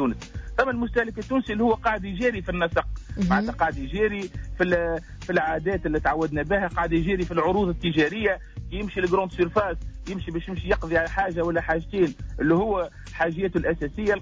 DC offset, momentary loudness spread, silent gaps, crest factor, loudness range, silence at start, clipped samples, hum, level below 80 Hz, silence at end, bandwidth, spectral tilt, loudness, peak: under 0.1%; 8 LU; none; 14 dB; 2 LU; 0 s; under 0.1%; none; -38 dBFS; 0 s; 8 kHz; -7 dB/octave; -25 LUFS; -10 dBFS